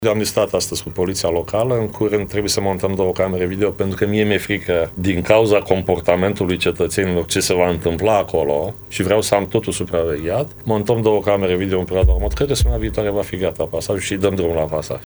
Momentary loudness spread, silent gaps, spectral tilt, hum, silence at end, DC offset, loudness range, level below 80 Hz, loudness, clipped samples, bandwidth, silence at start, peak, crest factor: 5 LU; none; -5 dB/octave; none; 0 s; under 0.1%; 2 LU; -30 dBFS; -18 LUFS; under 0.1%; over 20 kHz; 0 s; 0 dBFS; 18 dB